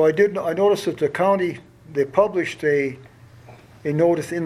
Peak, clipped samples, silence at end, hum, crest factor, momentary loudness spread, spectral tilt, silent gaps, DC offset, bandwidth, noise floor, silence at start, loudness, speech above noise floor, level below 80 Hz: -4 dBFS; under 0.1%; 0 s; none; 18 dB; 10 LU; -6.5 dB/octave; none; under 0.1%; 13.5 kHz; -45 dBFS; 0 s; -21 LUFS; 25 dB; -60 dBFS